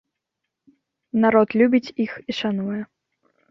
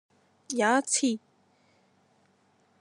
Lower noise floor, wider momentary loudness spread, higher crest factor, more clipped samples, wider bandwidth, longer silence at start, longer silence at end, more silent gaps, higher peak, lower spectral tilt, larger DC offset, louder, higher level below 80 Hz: first, -82 dBFS vs -67 dBFS; about the same, 12 LU vs 11 LU; about the same, 20 dB vs 20 dB; neither; second, 6.6 kHz vs 12 kHz; first, 1.15 s vs 0.5 s; second, 0.65 s vs 1.65 s; neither; first, -4 dBFS vs -12 dBFS; first, -7 dB/octave vs -2 dB/octave; neither; first, -21 LUFS vs -27 LUFS; first, -64 dBFS vs under -90 dBFS